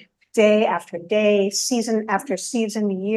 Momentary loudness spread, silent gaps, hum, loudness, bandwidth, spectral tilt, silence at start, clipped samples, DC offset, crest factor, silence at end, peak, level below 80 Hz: 7 LU; none; none; -20 LUFS; 12.5 kHz; -4 dB/octave; 0.35 s; under 0.1%; under 0.1%; 16 dB; 0 s; -4 dBFS; -72 dBFS